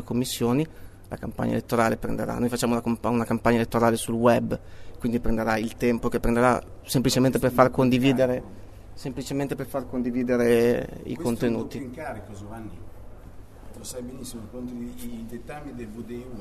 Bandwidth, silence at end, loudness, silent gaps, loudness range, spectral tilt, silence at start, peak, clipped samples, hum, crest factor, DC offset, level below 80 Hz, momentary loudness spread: 13.5 kHz; 0 s; -25 LUFS; none; 15 LU; -6 dB/octave; 0 s; -2 dBFS; under 0.1%; none; 22 dB; under 0.1%; -42 dBFS; 17 LU